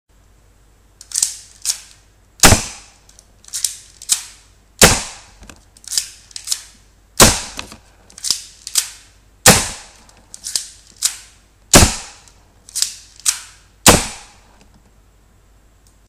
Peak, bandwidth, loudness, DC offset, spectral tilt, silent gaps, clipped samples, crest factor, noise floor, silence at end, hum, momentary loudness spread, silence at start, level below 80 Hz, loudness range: 0 dBFS; 16.5 kHz; -15 LUFS; under 0.1%; -2 dB/octave; none; 0.2%; 20 dB; -51 dBFS; 1.9 s; none; 21 LU; 1.15 s; -32 dBFS; 3 LU